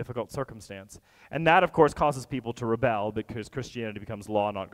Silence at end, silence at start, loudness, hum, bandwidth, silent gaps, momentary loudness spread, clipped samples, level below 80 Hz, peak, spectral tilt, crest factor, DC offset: 0.05 s; 0 s; -27 LUFS; none; 15.5 kHz; none; 16 LU; under 0.1%; -54 dBFS; -6 dBFS; -6 dB/octave; 22 dB; under 0.1%